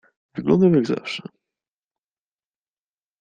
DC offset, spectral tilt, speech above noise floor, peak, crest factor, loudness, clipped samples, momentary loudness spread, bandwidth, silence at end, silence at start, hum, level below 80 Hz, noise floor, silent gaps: under 0.1%; -7.5 dB/octave; over 71 dB; -4 dBFS; 20 dB; -20 LUFS; under 0.1%; 16 LU; 9 kHz; 2 s; 0.35 s; none; -62 dBFS; under -90 dBFS; none